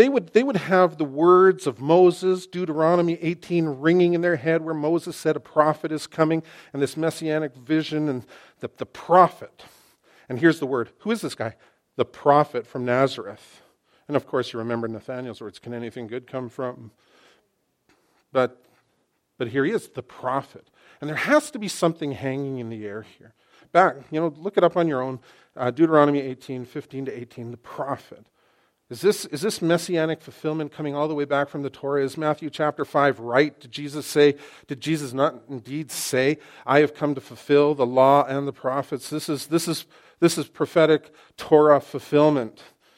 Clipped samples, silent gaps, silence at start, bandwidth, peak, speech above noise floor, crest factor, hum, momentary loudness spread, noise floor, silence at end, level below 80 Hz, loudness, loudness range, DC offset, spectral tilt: under 0.1%; none; 0 s; 16.5 kHz; -2 dBFS; 48 dB; 22 dB; none; 15 LU; -70 dBFS; 0.45 s; -70 dBFS; -23 LUFS; 9 LU; under 0.1%; -5.5 dB/octave